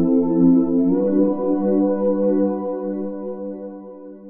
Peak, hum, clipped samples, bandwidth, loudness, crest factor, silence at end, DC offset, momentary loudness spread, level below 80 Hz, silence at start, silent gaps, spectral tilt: -6 dBFS; none; under 0.1%; 2.1 kHz; -19 LUFS; 14 dB; 0 s; under 0.1%; 16 LU; -58 dBFS; 0 s; none; -12.5 dB/octave